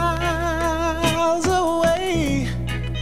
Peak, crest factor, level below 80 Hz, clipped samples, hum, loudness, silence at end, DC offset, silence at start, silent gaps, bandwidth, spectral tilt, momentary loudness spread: -6 dBFS; 14 dB; -32 dBFS; under 0.1%; none; -21 LUFS; 0 s; 1%; 0 s; none; 16 kHz; -5 dB/octave; 5 LU